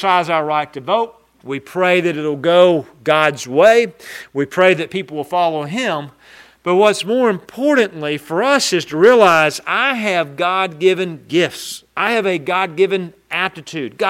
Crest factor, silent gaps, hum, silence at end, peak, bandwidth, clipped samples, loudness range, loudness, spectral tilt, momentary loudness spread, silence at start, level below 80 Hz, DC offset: 16 dB; none; none; 0 s; 0 dBFS; 16 kHz; under 0.1%; 4 LU; -16 LUFS; -4.5 dB/octave; 12 LU; 0 s; -64 dBFS; under 0.1%